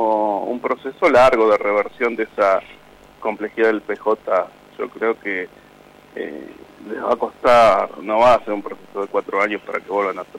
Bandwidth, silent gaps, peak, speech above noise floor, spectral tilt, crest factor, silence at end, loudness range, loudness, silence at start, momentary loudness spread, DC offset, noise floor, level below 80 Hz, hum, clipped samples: 12.5 kHz; none; -6 dBFS; 28 dB; -5 dB/octave; 14 dB; 0 s; 7 LU; -18 LUFS; 0 s; 18 LU; under 0.1%; -46 dBFS; -52 dBFS; none; under 0.1%